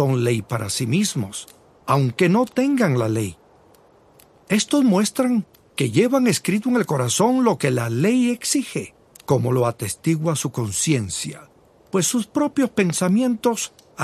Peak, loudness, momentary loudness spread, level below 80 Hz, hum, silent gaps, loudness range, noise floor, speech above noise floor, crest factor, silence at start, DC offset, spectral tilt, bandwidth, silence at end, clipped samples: -4 dBFS; -20 LUFS; 10 LU; -54 dBFS; none; none; 3 LU; -53 dBFS; 33 dB; 18 dB; 0 s; under 0.1%; -5 dB/octave; 14 kHz; 0 s; under 0.1%